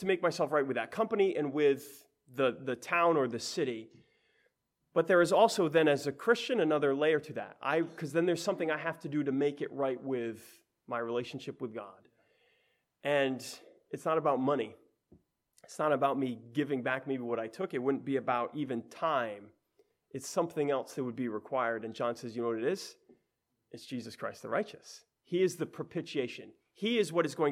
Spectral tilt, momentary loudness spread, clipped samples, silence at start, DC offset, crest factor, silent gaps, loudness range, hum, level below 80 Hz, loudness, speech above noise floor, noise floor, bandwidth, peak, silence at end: -5 dB/octave; 14 LU; under 0.1%; 0 s; under 0.1%; 20 dB; none; 8 LU; none; -82 dBFS; -32 LUFS; 50 dB; -82 dBFS; 16 kHz; -12 dBFS; 0 s